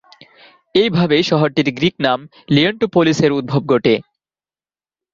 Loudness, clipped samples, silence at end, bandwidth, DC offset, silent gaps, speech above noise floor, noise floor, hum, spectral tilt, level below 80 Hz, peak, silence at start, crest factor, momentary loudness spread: -16 LUFS; under 0.1%; 1.1 s; 7.6 kHz; under 0.1%; none; over 75 dB; under -90 dBFS; none; -6 dB/octave; -54 dBFS; 0 dBFS; 0.75 s; 16 dB; 5 LU